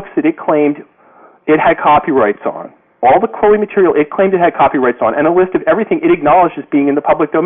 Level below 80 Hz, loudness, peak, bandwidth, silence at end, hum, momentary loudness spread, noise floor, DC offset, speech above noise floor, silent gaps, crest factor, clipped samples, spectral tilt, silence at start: -46 dBFS; -12 LUFS; -2 dBFS; 3.8 kHz; 0 s; none; 5 LU; -44 dBFS; under 0.1%; 32 dB; none; 8 dB; under 0.1%; -10 dB/octave; 0 s